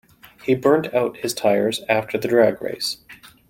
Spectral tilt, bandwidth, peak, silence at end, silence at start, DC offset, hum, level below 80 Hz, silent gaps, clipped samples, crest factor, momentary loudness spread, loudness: -4.5 dB/octave; 16.5 kHz; -2 dBFS; 0.35 s; 0.45 s; under 0.1%; none; -60 dBFS; none; under 0.1%; 18 dB; 9 LU; -20 LUFS